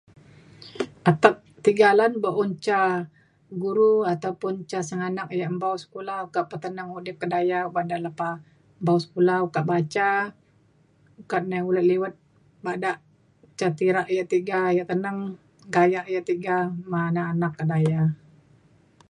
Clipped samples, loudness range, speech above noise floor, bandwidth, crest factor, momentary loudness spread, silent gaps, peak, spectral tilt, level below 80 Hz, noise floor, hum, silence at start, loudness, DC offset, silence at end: under 0.1%; 6 LU; 37 dB; 10.5 kHz; 24 dB; 13 LU; none; 0 dBFS; -7 dB/octave; -68 dBFS; -60 dBFS; none; 0.6 s; -24 LUFS; under 0.1%; 0.95 s